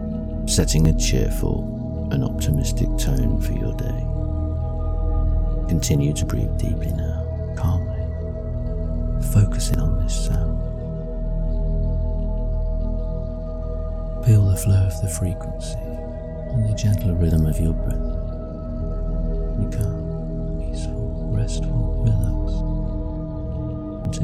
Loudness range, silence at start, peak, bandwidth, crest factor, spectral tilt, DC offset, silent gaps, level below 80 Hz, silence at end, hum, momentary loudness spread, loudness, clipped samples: 4 LU; 0 s; -4 dBFS; 15 kHz; 16 dB; -6.5 dB/octave; under 0.1%; none; -24 dBFS; 0 s; 60 Hz at -40 dBFS; 10 LU; -24 LUFS; under 0.1%